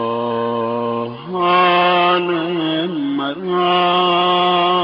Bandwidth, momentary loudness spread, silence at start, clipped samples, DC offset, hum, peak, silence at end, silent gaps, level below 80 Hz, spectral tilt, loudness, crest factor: 5.4 kHz; 8 LU; 0 s; under 0.1%; under 0.1%; none; -4 dBFS; 0 s; none; -62 dBFS; -2.5 dB/octave; -16 LUFS; 12 dB